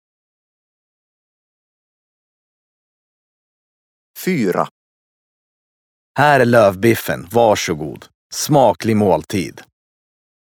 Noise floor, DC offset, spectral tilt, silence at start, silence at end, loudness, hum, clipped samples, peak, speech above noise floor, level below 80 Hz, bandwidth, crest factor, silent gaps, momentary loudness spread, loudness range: under -90 dBFS; under 0.1%; -5 dB/octave; 4.15 s; 0.8 s; -16 LUFS; none; under 0.1%; 0 dBFS; over 75 dB; -54 dBFS; 19.5 kHz; 18 dB; 4.71-6.15 s, 8.14-8.30 s; 14 LU; 11 LU